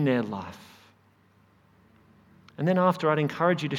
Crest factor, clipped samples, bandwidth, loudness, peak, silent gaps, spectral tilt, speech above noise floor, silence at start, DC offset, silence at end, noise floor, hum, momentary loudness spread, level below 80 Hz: 20 dB; under 0.1%; 15.5 kHz; -26 LUFS; -8 dBFS; none; -7.5 dB/octave; 36 dB; 0 s; under 0.1%; 0 s; -62 dBFS; none; 21 LU; -70 dBFS